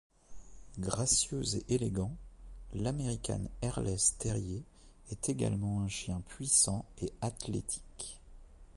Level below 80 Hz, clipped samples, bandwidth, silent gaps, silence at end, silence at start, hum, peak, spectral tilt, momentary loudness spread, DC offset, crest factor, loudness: -50 dBFS; under 0.1%; 11.5 kHz; none; 0 s; 0.3 s; none; -14 dBFS; -4 dB/octave; 16 LU; under 0.1%; 22 dB; -33 LUFS